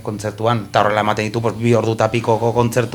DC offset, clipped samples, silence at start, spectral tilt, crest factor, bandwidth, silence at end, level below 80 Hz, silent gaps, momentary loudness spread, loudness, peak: under 0.1%; under 0.1%; 0 s; -6 dB/octave; 18 dB; 18 kHz; 0 s; -48 dBFS; none; 4 LU; -17 LUFS; 0 dBFS